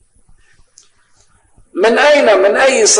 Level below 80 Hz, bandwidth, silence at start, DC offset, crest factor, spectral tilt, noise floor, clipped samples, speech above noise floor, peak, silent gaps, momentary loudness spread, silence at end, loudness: -52 dBFS; 10.5 kHz; 1.75 s; under 0.1%; 12 dB; -0.5 dB/octave; -51 dBFS; under 0.1%; 42 dB; 0 dBFS; none; 6 LU; 0 s; -10 LUFS